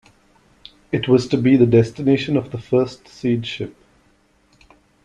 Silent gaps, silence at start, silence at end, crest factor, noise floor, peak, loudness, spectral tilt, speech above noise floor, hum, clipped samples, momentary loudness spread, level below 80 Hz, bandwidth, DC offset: none; 0.9 s; 1.35 s; 18 dB; -58 dBFS; -2 dBFS; -18 LUFS; -7.5 dB/octave; 41 dB; none; under 0.1%; 12 LU; -52 dBFS; 9.6 kHz; under 0.1%